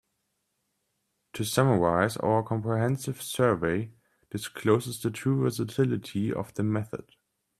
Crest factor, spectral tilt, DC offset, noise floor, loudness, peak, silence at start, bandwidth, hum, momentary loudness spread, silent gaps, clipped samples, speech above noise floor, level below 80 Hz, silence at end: 22 dB; -6 dB/octave; under 0.1%; -78 dBFS; -28 LUFS; -6 dBFS; 1.35 s; 14.5 kHz; none; 13 LU; none; under 0.1%; 51 dB; -62 dBFS; 0.55 s